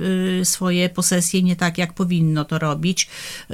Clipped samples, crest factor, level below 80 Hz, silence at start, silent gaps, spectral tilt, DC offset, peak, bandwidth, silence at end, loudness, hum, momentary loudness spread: under 0.1%; 16 dB; -54 dBFS; 0 s; none; -4.5 dB/octave; under 0.1%; -4 dBFS; 16 kHz; 0 s; -19 LUFS; none; 5 LU